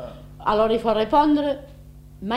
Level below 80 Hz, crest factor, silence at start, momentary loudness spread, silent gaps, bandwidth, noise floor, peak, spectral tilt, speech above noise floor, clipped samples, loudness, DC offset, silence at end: -44 dBFS; 16 dB; 0 s; 16 LU; none; 12 kHz; -43 dBFS; -6 dBFS; -7 dB/octave; 23 dB; under 0.1%; -21 LUFS; under 0.1%; 0 s